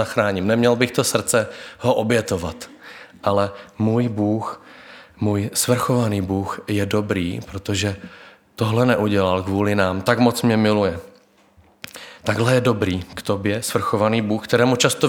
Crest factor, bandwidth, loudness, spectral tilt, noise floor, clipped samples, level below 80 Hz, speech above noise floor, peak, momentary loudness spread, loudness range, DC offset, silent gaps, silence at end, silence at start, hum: 18 dB; 19 kHz; -20 LUFS; -5 dB/octave; -54 dBFS; under 0.1%; -52 dBFS; 34 dB; -2 dBFS; 13 LU; 3 LU; under 0.1%; none; 0 s; 0 s; none